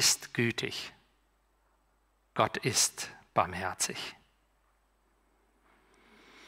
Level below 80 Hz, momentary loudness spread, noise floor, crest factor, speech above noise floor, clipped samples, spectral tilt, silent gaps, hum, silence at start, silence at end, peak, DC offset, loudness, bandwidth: -68 dBFS; 14 LU; -71 dBFS; 24 dB; 40 dB; under 0.1%; -2 dB/octave; none; none; 0 s; 0 s; -10 dBFS; under 0.1%; -31 LUFS; 16 kHz